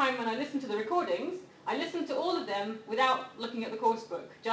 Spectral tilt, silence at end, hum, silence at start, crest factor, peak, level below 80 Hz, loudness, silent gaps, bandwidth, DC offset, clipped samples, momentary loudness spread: -4 dB/octave; 0 s; none; 0 s; 18 dB; -14 dBFS; -78 dBFS; -33 LUFS; none; 8 kHz; under 0.1%; under 0.1%; 9 LU